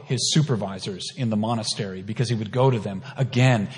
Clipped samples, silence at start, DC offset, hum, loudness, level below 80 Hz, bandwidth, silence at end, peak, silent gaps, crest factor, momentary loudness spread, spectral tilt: under 0.1%; 0 s; under 0.1%; none; -24 LUFS; -64 dBFS; 11 kHz; 0 s; -6 dBFS; none; 16 dB; 10 LU; -5 dB/octave